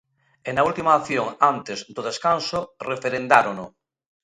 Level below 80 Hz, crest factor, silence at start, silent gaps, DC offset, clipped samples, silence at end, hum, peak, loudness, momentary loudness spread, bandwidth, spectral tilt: -60 dBFS; 22 dB; 0.45 s; none; under 0.1%; under 0.1%; 0.55 s; none; 0 dBFS; -22 LUFS; 13 LU; 11.5 kHz; -4 dB/octave